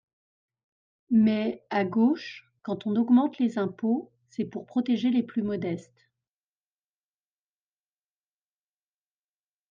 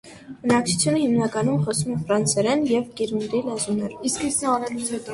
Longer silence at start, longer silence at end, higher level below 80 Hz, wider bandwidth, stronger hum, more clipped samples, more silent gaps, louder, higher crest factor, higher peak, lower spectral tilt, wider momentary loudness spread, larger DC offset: first, 1.1 s vs 0.05 s; first, 3.9 s vs 0 s; second, -74 dBFS vs -56 dBFS; second, 7 kHz vs 11.5 kHz; first, 50 Hz at -60 dBFS vs none; neither; neither; second, -27 LUFS vs -23 LUFS; about the same, 18 dB vs 16 dB; second, -12 dBFS vs -6 dBFS; first, -8 dB/octave vs -4.5 dB/octave; first, 13 LU vs 7 LU; neither